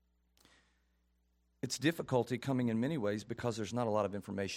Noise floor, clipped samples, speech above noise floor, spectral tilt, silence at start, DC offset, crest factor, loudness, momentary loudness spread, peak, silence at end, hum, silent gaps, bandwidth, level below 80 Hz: -76 dBFS; under 0.1%; 40 dB; -5.5 dB/octave; 1.65 s; under 0.1%; 20 dB; -36 LUFS; 6 LU; -18 dBFS; 0 s; none; none; 16.5 kHz; -72 dBFS